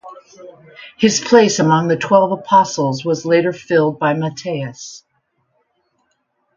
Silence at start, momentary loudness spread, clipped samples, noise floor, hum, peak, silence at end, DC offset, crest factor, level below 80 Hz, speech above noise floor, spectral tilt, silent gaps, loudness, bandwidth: 0.05 s; 12 LU; under 0.1%; -67 dBFS; none; 0 dBFS; 1.6 s; under 0.1%; 16 dB; -60 dBFS; 51 dB; -5 dB/octave; none; -15 LUFS; 7.6 kHz